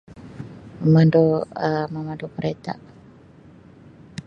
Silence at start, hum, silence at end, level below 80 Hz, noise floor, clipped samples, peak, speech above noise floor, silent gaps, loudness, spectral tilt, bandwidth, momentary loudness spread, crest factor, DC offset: 0.1 s; none; 0.05 s; -56 dBFS; -48 dBFS; under 0.1%; -4 dBFS; 28 dB; none; -21 LUFS; -9 dB/octave; 6.6 kHz; 23 LU; 18 dB; under 0.1%